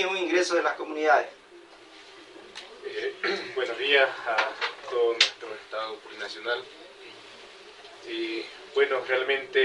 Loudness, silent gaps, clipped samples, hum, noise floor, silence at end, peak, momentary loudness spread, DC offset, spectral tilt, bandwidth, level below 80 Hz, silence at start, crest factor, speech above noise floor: -27 LUFS; none; under 0.1%; none; -50 dBFS; 0 s; -4 dBFS; 23 LU; under 0.1%; -1.5 dB/octave; 11.5 kHz; -74 dBFS; 0 s; 24 dB; 24 dB